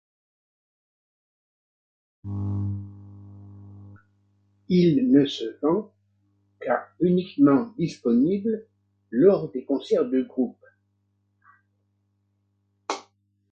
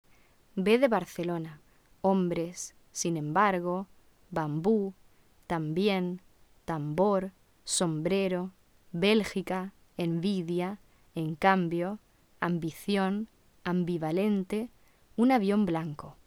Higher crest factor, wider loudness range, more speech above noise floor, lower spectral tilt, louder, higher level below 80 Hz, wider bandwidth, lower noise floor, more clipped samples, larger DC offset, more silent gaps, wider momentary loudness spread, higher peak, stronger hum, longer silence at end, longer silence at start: about the same, 20 dB vs 20 dB; first, 14 LU vs 2 LU; first, 49 dB vs 32 dB; first, -8 dB/octave vs -5.5 dB/octave; first, -24 LUFS vs -30 LUFS; first, -56 dBFS vs -62 dBFS; second, 7.6 kHz vs 16 kHz; first, -71 dBFS vs -61 dBFS; neither; neither; neither; about the same, 16 LU vs 15 LU; first, -6 dBFS vs -10 dBFS; first, 50 Hz at -45 dBFS vs none; first, 0.5 s vs 0.15 s; first, 2.25 s vs 0.55 s